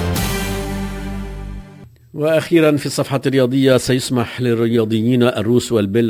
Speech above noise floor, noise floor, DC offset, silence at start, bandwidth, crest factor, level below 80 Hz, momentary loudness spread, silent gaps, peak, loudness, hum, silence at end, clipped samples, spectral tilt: 25 dB; -41 dBFS; under 0.1%; 0 s; 16 kHz; 16 dB; -34 dBFS; 14 LU; none; -2 dBFS; -17 LUFS; none; 0 s; under 0.1%; -6 dB/octave